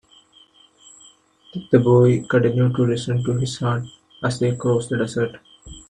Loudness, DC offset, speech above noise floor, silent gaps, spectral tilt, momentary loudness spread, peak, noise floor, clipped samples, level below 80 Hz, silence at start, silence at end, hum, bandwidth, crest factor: -20 LUFS; under 0.1%; 34 dB; none; -7 dB/octave; 12 LU; -2 dBFS; -53 dBFS; under 0.1%; -52 dBFS; 1.55 s; 0.1 s; none; 10 kHz; 20 dB